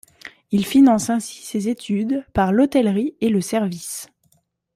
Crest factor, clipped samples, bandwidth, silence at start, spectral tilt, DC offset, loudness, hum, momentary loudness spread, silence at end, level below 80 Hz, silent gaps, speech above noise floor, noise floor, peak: 16 dB; under 0.1%; 15.5 kHz; 0.25 s; -5.5 dB/octave; under 0.1%; -19 LUFS; none; 14 LU; 0.7 s; -50 dBFS; none; 45 dB; -64 dBFS; -4 dBFS